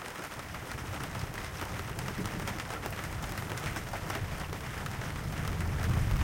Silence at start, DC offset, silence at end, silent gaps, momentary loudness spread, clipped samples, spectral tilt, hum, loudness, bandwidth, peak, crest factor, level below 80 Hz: 0 s; under 0.1%; 0 s; none; 6 LU; under 0.1%; -5 dB/octave; none; -37 LUFS; 17 kHz; -16 dBFS; 18 dB; -42 dBFS